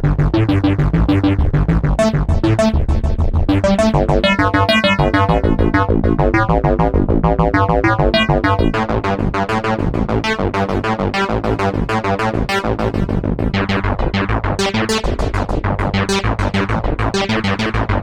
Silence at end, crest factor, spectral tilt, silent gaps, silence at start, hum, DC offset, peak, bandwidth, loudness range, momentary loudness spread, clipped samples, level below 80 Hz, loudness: 0 s; 12 dB; -6.5 dB/octave; none; 0 s; none; under 0.1%; -2 dBFS; 12.5 kHz; 4 LU; 5 LU; under 0.1%; -22 dBFS; -16 LUFS